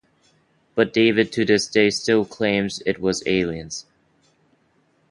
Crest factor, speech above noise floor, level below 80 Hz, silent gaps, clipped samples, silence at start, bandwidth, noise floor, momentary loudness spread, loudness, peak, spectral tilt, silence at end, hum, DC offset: 20 dB; 43 dB; -54 dBFS; none; under 0.1%; 0.75 s; 11.5 kHz; -63 dBFS; 11 LU; -20 LUFS; -2 dBFS; -4.5 dB/octave; 1.3 s; none; under 0.1%